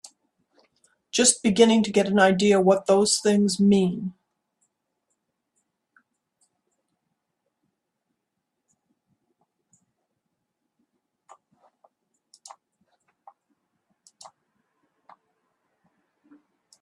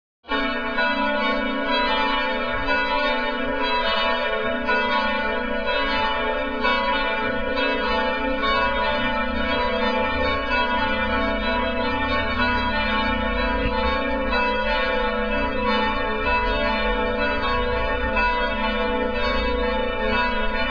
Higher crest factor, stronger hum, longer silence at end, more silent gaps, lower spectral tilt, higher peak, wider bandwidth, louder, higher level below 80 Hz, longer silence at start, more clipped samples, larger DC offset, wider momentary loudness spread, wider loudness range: first, 24 dB vs 16 dB; neither; first, 12.7 s vs 0 s; neither; second, -4 dB/octave vs -6 dB/octave; first, -4 dBFS vs -8 dBFS; first, 12.5 kHz vs 5.4 kHz; about the same, -20 LUFS vs -22 LUFS; second, -66 dBFS vs -32 dBFS; first, 1.15 s vs 0.25 s; neither; second, under 0.1% vs 2%; first, 8 LU vs 3 LU; first, 9 LU vs 1 LU